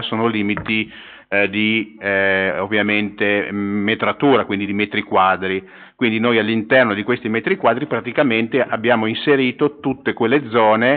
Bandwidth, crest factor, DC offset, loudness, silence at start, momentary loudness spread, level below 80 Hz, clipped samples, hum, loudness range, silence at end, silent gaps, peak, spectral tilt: 4.6 kHz; 16 dB; under 0.1%; -18 LUFS; 0 s; 6 LU; -58 dBFS; under 0.1%; none; 1 LU; 0 s; none; -2 dBFS; -3 dB/octave